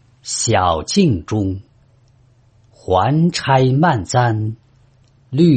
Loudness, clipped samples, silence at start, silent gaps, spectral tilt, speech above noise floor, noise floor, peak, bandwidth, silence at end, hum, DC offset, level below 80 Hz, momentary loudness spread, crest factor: -17 LUFS; under 0.1%; 0.25 s; none; -5.5 dB/octave; 37 dB; -52 dBFS; -2 dBFS; 8.8 kHz; 0 s; none; under 0.1%; -48 dBFS; 11 LU; 16 dB